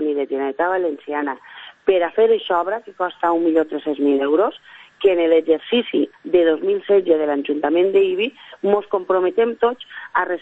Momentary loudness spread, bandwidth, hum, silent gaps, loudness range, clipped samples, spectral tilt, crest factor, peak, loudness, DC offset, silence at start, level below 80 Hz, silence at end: 8 LU; 4 kHz; none; none; 2 LU; under 0.1%; -7 dB/octave; 16 dB; -2 dBFS; -19 LUFS; under 0.1%; 0 s; -62 dBFS; 0.05 s